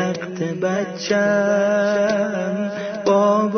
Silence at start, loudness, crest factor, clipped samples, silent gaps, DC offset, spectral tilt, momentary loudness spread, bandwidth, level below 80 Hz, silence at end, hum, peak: 0 s; -20 LUFS; 14 dB; under 0.1%; none; under 0.1%; -5.5 dB/octave; 8 LU; 6.6 kHz; -64 dBFS; 0 s; none; -6 dBFS